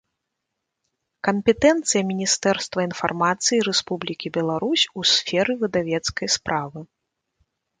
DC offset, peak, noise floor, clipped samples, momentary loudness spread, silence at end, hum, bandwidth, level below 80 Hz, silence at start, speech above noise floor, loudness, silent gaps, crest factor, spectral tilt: under 0.1%; -4 dBFS; -81 dBFS; under 0.1%; 9 LU; 0.95 s; none; 9.6 kHz; -56 dBFS; 1.25 s; 59 dB; -21 LUFS; none; 20 dB; -3 dB/octave